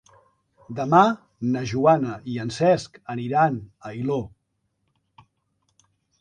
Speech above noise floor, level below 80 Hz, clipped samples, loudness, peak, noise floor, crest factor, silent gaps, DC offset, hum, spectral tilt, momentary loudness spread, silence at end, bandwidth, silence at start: 52 dB; -60 dBFS; under 0.1%; -23 LUFS; -4 dBFS; -74 dBFS; 22 dB; none; under 0.1%; none; -7 dB/octave; 16 LU; 1.95 s; 10 kHz; 0.7 s